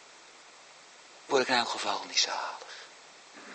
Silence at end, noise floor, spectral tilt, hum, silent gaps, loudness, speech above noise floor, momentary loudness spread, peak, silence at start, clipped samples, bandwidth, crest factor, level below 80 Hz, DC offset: 0 s; -54 dBFS; -0.5 dB/octave; none; none; -29 LUFS; 24 dB; 24 LU; -10 dBFS; 0 s; under 0.1%; 8.4 kHz; 22 dB; -86 dBFS; under 0.1%